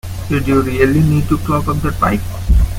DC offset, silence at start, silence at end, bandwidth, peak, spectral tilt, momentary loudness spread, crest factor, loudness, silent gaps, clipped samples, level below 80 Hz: under 0.1%; 0.05 s; 0 s; 16.5 kHz; 0 dBFS; -7.5 dB/octave; 6 LU; 14 dB; -15 LUFS; none; under 0.1%; -20 dBFS